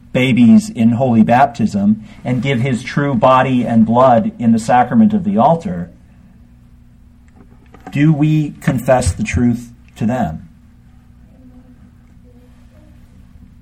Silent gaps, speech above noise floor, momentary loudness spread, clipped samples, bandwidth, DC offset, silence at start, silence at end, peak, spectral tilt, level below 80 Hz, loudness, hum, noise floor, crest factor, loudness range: none; 31 dB; 10 LU; under 0.1%; 11 kHz; under 0.1%; 0.15 s; 3.15 s; 0 dBFS; -7 dB/octave; -38 dBFS; -14 LUFS; 60 Hz at -40 dBFS; -44 dBFS; 14 dB; 9 LU